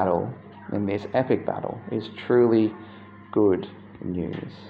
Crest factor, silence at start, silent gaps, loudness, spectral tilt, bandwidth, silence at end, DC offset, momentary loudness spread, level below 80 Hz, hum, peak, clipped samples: 16 dB; 0 s; none; -25 LUFS; -9.5 dB/octave; 5.2 kHz; 0 s; under 0.1%; 19 LU; -64 dBFS; none; -8 dBFS; under 0.1%